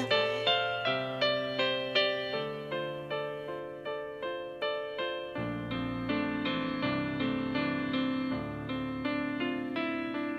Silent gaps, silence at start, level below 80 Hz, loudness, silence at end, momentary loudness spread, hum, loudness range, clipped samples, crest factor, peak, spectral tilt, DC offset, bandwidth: none; 0 s; -60 dBFS; -32 LUFS; 0 s; 9 LU; none; 6 LU; under 0.1%; 18 dB; -14 dBFS; -6 dB/octave; under 0.1%; 9.2 kHz